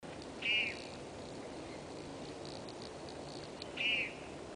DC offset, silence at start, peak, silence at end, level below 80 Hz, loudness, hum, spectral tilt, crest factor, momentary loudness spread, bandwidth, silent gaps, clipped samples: under 0.1%; 0 s; -24 dBFS; 0 s; -64 dBFS; -39 LUFS; none; -3 dB/octave; 18 dB; 14 LU; 10.5 kHz; none; under 0.1%